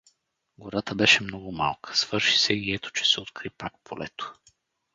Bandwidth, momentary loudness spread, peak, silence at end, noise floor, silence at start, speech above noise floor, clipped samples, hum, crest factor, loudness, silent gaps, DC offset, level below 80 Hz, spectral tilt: 9.6 kHz; 18 LU; -6 dBFS; 0.6 s; -68 dBFS; 0.6 s; 41 dB; under 0.1%; none; 22 dB; -23 LUFS; none; under 0.1%; -58 dBFS; -2.5 dB/octave